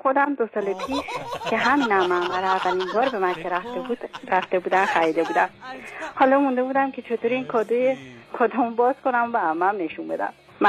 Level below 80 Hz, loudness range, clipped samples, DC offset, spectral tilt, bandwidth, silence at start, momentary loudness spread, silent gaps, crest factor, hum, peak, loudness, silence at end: -64 dBFS; 1 LU; under 0.1%; under 0.1%; -5 dB/octave; 13.5 kHz; 0.05 s; 10 LU; none; 18 dB; none; -6 dBFS; -23 LUFS; 0 s